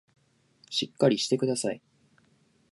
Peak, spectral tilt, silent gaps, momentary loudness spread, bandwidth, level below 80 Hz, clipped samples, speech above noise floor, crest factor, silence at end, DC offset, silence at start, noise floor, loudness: -10 dBFS; -4.5 dB/octave; none; 9 LU; 11.5 kHz; -76 dBFS; under 0.1%; 39 dB; 22 dB; 0.95 s; under 0.1%; 0.7 s; -66 dBFS; -27 LUFS